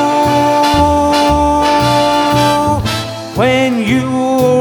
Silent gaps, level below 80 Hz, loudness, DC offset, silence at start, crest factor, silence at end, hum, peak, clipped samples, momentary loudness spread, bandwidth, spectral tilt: none; -30 dBFS; -12 LUFS; under 0.1%; 0 s; 12 dB; 0 s; none; 0 dBFS; under 0.1%; 4 LU; 19.5 kHz; -5 dB/octave